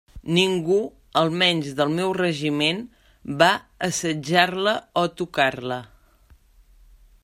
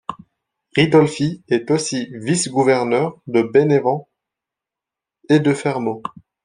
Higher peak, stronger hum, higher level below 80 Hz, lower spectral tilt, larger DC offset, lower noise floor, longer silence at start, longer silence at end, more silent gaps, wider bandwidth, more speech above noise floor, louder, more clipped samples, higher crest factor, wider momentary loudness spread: about the same, -2 dBFS vs -2 dBFS; neither; first, -54 dBFS vs -60 dBFS; second, -4 dB/octave vs -5.5 dB/octave; neither; second, -55 dBFS vs -86 dBFS; about the same, 0.15 s vs 0.1 s; first, 1.4 s vs 0.35 s; neither; first, 16 kHz vs 10.5 kHz; second, 33 dB vs 69 dB; second, -22 LUFS vs -18 LUFS; neither; first, 22 dB vs 16 dB; about the same, 12 LU vs 10 LU